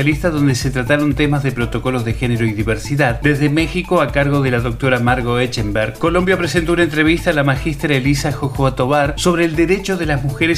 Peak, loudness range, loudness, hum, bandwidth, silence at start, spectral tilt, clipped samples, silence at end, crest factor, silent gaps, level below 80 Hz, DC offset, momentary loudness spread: 0 dBFS; 1 LU; -16 LUFS; none; 15.5 kHz; 0 s; -6 dB/octave; under 0.1%; 0 s; 16 dB; none; -30 dBFS; under 0.1%; 4 LU